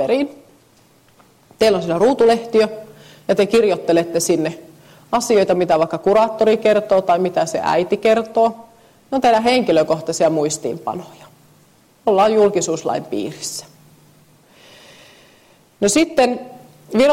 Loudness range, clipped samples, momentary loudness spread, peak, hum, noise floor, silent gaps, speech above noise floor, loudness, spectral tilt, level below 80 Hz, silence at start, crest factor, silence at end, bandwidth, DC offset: 6 LU; under 0.1%; 11 LU; -4 dBFS; none; -53 dBFS; none; 36 dB; -17 LUFS; -4.5 dB/octave; -56 dBFS; 0 s; 14 dB; 0 s; 16 kHz; under 0.1%